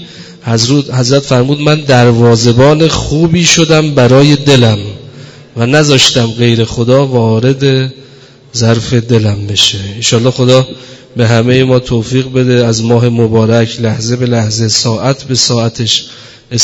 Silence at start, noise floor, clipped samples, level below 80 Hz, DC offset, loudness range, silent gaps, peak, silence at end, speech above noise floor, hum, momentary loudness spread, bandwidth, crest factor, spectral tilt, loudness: 0 s; -31 dBFS; 1%; -36 dBFS; under 0.1%; 4 LU; none; 0 dBFS; 0 s; 23 dB; none; 8 LU; 11 kHz; 8 dB; -5 dB/octave; -9 LUFS